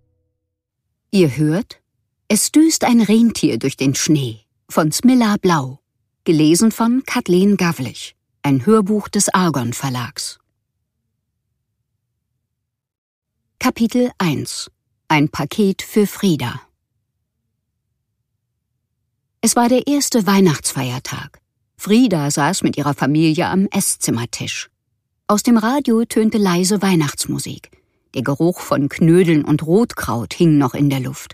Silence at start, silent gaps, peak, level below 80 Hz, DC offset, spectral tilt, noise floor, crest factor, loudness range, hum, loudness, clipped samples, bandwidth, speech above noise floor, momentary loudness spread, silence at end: 1.15 s; 12.98-13.22 s; 0 dBFS; -52 dBFS; under 0.1%; -5 dB/octave; -77 dBFS; 18 dB; 7 LU; none; -16 LUFS; under 0.1%; 15.5 kHz; 61 dB; 12 LU; 0.05 s